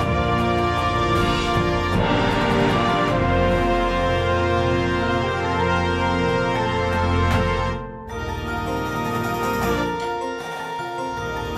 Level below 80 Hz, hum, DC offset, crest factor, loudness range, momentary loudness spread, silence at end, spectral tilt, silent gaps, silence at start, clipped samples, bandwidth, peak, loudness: -34 dBFS; none; under 0.1%; 14 dB; 5 LU; 8 LU; 0 s; -6 dB/octave; none; 0 s; under 0.1%; 14.5 kHz; -6 dBFS; -21 LUFS